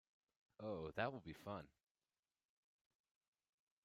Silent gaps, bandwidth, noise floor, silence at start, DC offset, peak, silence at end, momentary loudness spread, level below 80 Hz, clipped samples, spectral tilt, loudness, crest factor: none; 13 kHz; under -90 dBFS; 0.6 s; under 0.1%; -28 dBFS; 2.15 s; 9 LU; -78 dBFS; under 0.1%; -7 dB/octave; -49 LUFS; 24 dB